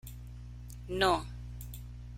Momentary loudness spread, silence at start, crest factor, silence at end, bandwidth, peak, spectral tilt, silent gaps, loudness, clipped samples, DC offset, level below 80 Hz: 19 LU; 0.05 s; 24 dB; 0 s; 16.5 kHz; -14 dBFS; -4.5 dB/octave; none; -33 LUFS; under 0.1%; under 0.1%; -46 dBFS